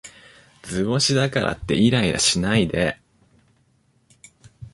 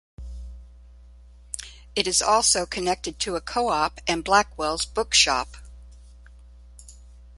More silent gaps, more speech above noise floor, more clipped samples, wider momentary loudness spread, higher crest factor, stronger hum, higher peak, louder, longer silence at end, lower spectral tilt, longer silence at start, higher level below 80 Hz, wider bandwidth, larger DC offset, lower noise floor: neither; first, 42 dB vs 25 dB; neither; second, 10 LU vs 20 LU; about the same, 20 dB vs 24 dB; second, none vs 60 Hz at -45 dBFS; about the same, -4 dBFS vs -2 dBFS; about the same, -20 LUFS vs -22 LUFS; about the same, 0.05 s vs 0.05 s; first, -4 dB/octave vs -1.5 dB/octave; second, 0.05 s vs 0.2 s; about the same, -44 dBFS vs -44 dBFS; about the same, 11.5 kHz vs 12 kHz; neither; first, -62 dBFS vs -48 dBFS